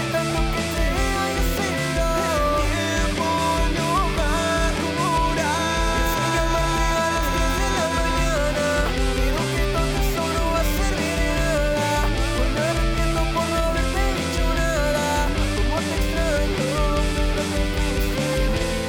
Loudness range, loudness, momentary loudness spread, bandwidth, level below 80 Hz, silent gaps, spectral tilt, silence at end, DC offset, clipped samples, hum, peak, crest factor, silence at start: 1 LU; -22 LUFS; 2 LU; 19.5 kHz; -26 dBFS; none; -4.5 dB/octave; 0 s; under 0.1%; under 0.1%; none; -12 dBFS; 8 dB; 0 s